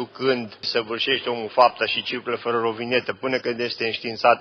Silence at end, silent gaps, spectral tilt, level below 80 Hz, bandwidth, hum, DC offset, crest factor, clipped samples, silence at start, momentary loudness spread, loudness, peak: 0 s; none; -5 dB/octave; -68 dBFS; 6.6 kHz; none; under 0.1%; 20 dB; under 0.1%; 0 s; 7 LU; -23 LUFS; -4 dBFS